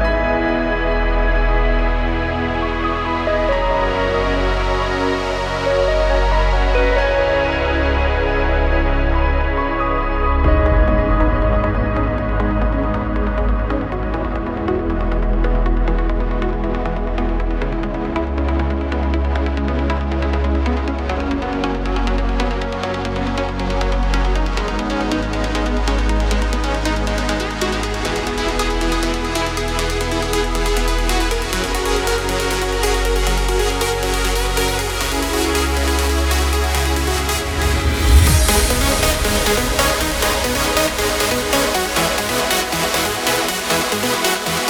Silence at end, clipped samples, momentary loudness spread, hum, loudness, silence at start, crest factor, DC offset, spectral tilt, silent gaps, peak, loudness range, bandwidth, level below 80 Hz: 0 s; under 0.1%; 5 LU; none; -18 LUFS; 0 s; 16 dB; under 0.1%; -4.5 dB/octave; none; 0 dBFS; 5 LU; over 20 kHz; -20 dBFS